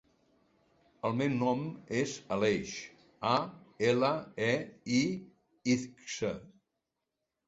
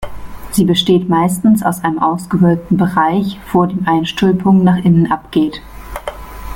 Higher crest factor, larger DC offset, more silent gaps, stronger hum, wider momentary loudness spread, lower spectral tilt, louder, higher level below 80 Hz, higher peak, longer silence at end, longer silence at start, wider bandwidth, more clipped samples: first, 20 dB vs 12 dB; neither; neither; neither; second, 11 LU vs 16 LU; second, -5 dB/octave vs -6.5 dB/octave; second, -33 LUFS vs -13 LUFS; second, -68 dBFS vs -36 dBFS; second, -14 dBFS vs -2 dBFS; first, 1 s vs 0 s; first, 1.05 s vs 0 s; second, 8 kHz vs 17 kHz; neither